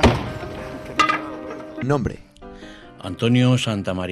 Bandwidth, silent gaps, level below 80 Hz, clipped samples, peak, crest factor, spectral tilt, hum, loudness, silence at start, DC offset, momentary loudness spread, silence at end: 12.5 kHz; none; -38 dBFS; under 0.1%; -4 dBFS; 18 dB; -6 dB/octave; none; -22 LUFS; 0 s; under 0.1%; 22 LU; 0 s